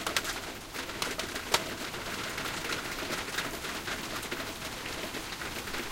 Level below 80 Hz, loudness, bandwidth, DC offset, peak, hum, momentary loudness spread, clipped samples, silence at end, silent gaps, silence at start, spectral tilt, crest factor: -52 dBFS; -34 LUFS; 17 kHz; under 0.1%; -8 dBFS; none; 7 LU; under 0.1%; 0 s; none; 0 s; -2 dB/octave; 28 dB